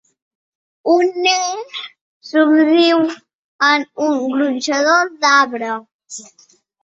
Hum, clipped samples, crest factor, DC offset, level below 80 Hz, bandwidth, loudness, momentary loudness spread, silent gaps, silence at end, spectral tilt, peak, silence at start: none; under 0.1%; 16 dB; under 0.1%; -68 dBFS; 8 kHz; -15 LUFS; 19 LU; 2.01-2.21 s, 3.34-3.59 s, 5.94-5.99 s; 0.6 s; -2 dB/octave; 0 dBFS; 0.85 s